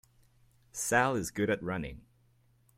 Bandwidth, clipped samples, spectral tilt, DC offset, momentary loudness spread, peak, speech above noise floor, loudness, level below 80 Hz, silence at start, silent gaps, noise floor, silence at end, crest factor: 16.5 kHz; under 0.1%; -4.5 dB/octave; under 0.1%; 14 LU; -12 dBFS; 36 dB; -31 LUFS; -58 dBFS; 0.75 s; none; -67 dBFS; 0.75 s; 22 dB